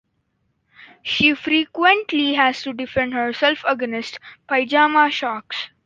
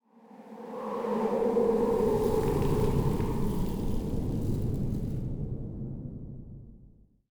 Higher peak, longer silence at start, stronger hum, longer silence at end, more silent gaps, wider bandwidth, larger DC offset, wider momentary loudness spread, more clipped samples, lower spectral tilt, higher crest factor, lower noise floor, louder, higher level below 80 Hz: first, -2 dBFS vs -14 dBFS; first, 0.8 s vs 0.3 s; neither; second, 0.2 s vs 0.45 s; neither; second, 7.6 kHz vs over 20 kHz; neither; second, 12 LU vs 17 LU; neither; second, -4 dB/octave vs -8.5 dB/octave; about the same, 18 dB vs 16 dB; first, -69 dBFS vs -57 dBFS; first, -19 LUFS vs -30 LUFS; second, -56 dBFS vs -38 dBFS